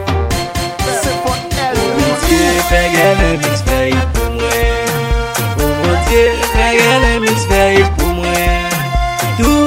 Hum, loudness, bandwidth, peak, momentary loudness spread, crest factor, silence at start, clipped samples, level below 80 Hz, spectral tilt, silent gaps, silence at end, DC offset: none; -13 LUFS; 16.5 kHz; 0 dBFS; 6 LU; 12 dB; 0 s; under 0.1%; -20 dBFS; -4.5 dB/octave; none; 0 s; under 0.1%